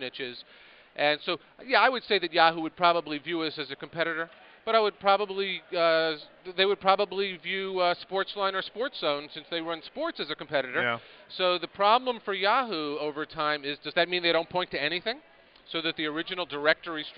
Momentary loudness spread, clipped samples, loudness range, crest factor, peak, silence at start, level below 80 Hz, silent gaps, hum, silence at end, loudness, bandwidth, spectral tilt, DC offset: 12 LU; under 0.1%; 4 LU; 24 dB; -6 dBFS; 0 s; -70 dBFS; none; none; 0 s; -28 LUFS; 5.4 kHz; -0.5 dB/octave; under 0.1%